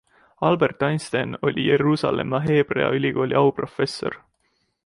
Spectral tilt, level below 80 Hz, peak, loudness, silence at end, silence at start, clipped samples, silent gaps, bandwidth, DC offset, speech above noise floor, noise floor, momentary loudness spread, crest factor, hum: -6.5 dB/octave; -56 dBFS; -4 dBFS; -22 LUFS; 0.7 s; 0.4 s; under 0.1%; none; 11.5 kHz; under 0.1%; 49 dB; -70 dBFS; 7 LU; 18 dB; none